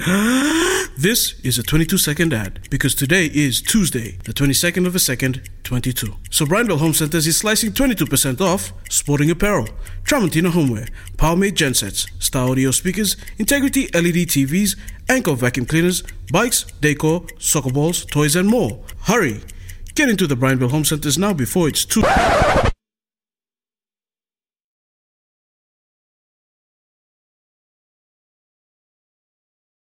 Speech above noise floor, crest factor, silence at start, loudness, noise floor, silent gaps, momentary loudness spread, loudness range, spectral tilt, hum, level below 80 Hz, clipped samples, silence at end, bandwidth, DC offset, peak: over 72 dB; 18 dB; 0 s; -17 LUFS; under -90 dBFS; none; 7 LU; 2 LU; -4 dB/octave; none; -34 dBFS; under 0.1%; 7.25 s; 17 kHz; under 0.1%; -2 dBFS